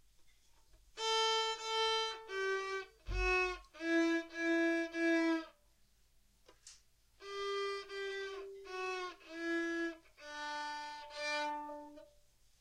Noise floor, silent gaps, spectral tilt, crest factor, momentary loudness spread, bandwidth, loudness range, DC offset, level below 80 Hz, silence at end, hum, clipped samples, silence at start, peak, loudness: -69 dBFS; none; -3 dB/octave; 16 dB; 15 LU; 11.5 kHz; 8 LU; under 0.1%; -56 dBFS; 0.55 s; none; under 0.1%; 0.2 s; -22 dBFS; -37 LUFS